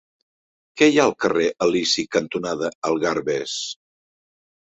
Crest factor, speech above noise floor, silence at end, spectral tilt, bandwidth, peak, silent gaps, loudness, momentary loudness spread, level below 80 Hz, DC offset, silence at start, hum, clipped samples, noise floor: 20 dB; over 69 dB; 1.05 s; -3.5 dB/octave; 8.2 kHz; -2 dBFS; 2.75-2.82 s; -21 LUFS; 11 LU; -62 dBFS; under 0.1%; 0.75 s; none; under 0.1%; under -90 dBFS